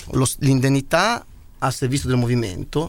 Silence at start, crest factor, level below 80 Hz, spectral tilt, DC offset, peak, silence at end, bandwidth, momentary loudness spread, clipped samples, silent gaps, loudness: 0 s; 16 dB; -38 dBFS; -5.5 dB/octave; 0.2%; -4 dBFS; 0 s; 16.5 kHz; 7 LU; under 0.1%; none; -20 LUFS